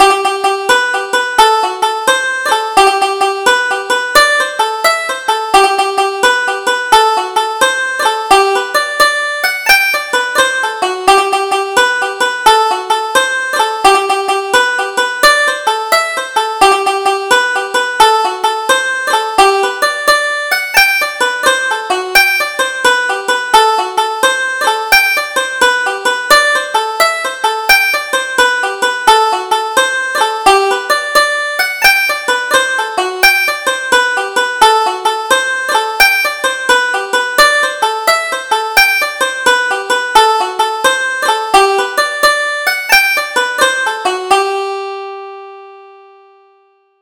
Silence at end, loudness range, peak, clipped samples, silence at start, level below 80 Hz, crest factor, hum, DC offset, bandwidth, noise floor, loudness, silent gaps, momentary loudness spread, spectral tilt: 1.1 s; 1 LU; 0 dBFS; 0.1%; 0 s; -46 dBFS; 12 dB; none; under 0.1%; over 20 kHz; -52 dBFS; -11 LUFS; none; 6 LU; 0 dB/octave